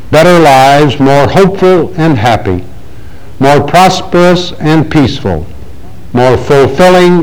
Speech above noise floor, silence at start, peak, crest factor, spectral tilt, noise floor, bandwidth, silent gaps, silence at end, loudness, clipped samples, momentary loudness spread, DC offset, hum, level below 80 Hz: 24 dB; 0.05 s; 0 dBFS; 8 dB; -6 dB/octave; -30 dBFS; over 20 kHz; none; 0 s; -7 LUFS; 4%; 11 LU; 10%; none; -30 dBFS